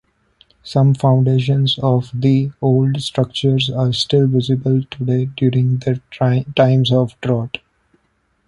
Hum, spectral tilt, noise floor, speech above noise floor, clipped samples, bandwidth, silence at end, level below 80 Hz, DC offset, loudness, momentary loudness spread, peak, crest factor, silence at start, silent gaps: none; -7.5 dB/octave; -64 dBFS; 48 dB; under 0.1%; 11 kHz; 0.9 s; -50 dBFS; under 0.1%; -16 LUFS; 6 LU; 0 dBFS; 16 dB; 0.65 s; none